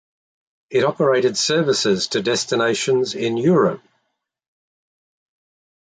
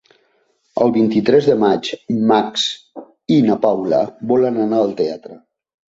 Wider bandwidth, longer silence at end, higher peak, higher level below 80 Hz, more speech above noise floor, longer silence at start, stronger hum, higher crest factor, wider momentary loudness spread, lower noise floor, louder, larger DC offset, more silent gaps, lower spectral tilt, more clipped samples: first, 9.6 kHz vs 7.8 kHz; first, 2.1 s vs 0.6 s; about the same, -4 dBFS vs -2 dBFS; second, -64 dBFS vs -58 dBFS; first, 56 dB vs 46 dB; about the same, 0.7 s vs 0.75 s; neither; about the same, 16 dB vs 16 dB; second, 4 LU vs 9 LU; first, -75 dBFS vs -62 dBFS; second, -19 LUFS vs -16 LUFS; neither; neither; second, -4 dB/octave vs -6 dB/octave; neither